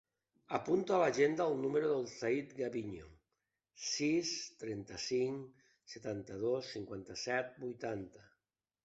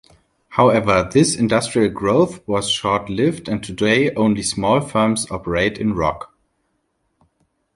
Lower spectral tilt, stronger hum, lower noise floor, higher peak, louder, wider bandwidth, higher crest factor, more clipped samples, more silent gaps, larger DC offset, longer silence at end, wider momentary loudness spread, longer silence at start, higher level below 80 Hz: about the same, -4 dB/octave vs -5 dB/octave; neither; first, under -90 dBFS vs -69 dBFS; second, -18 dBFS vs -2 dBFS; second, -37 LUFS vs -18 LUFS; second, 8 kHz vs 11.5 kHz; about the same, 20 dB vs 16 dB; neither; neither; neither; second, 0.6 s vs 1.5 s; first, 14 LU vs 7 LU; about the same, 0.5 s vs 0.5 s; second, -72 dBFS vs -44 dBFS